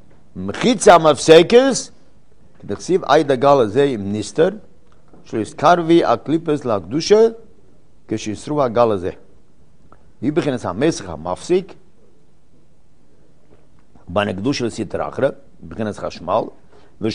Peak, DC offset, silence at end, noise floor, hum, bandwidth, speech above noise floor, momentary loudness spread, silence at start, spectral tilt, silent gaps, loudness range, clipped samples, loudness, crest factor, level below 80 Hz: 0 dBFS; 1%; 0 s; -55 dBFS; none; 10.5 kHz; 39 dB; 16 LU; 0.35 s; -5 dB/octave; none; 11 LU; 0.1%; -17 LUFS; 18 dB; -50 dBFS